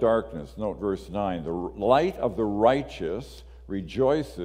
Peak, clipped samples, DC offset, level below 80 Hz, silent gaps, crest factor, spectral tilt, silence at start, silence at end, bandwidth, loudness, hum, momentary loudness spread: -6 dBFS; under 0.1%; under 0.1%; -46 dBFS; none; 20 dB; -7 dB/octave; 0 s; 0 s; 15.5 kHz; -27 LUFS; none; 13 LU